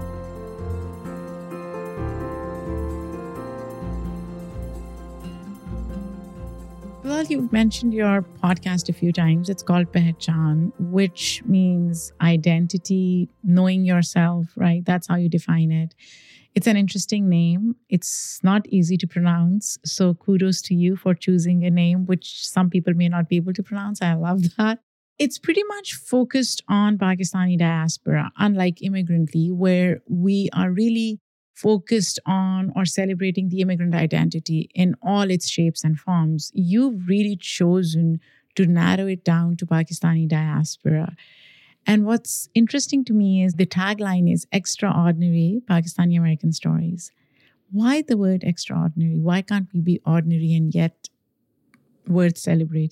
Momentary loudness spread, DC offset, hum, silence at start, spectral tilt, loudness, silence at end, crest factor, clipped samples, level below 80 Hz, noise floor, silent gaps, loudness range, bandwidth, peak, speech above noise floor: 13 LU; under 0.1%; none; 0 s; -6 dB/octave; -21 LUFS; 0 s; 16 dB; under 0.1%; -46 dBFS; -71 dBFS; 24.83-25.16 s, 31.21-31.54 s; 6 LU; 13.5 kHz; -6 dBFS; 51 dB